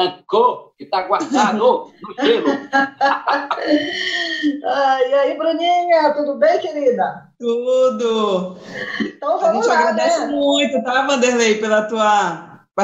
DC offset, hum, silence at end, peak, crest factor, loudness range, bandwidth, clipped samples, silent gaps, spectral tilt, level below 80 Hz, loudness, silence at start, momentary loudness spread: under 0.1%; none; 0 s; -2 dBFS; 14 dB; 2 LU; 10.5 kHz; under 0.1%; none; -3.5 dB/octave; -68 dBFS; -17 LUFS; 0 s; 8 LU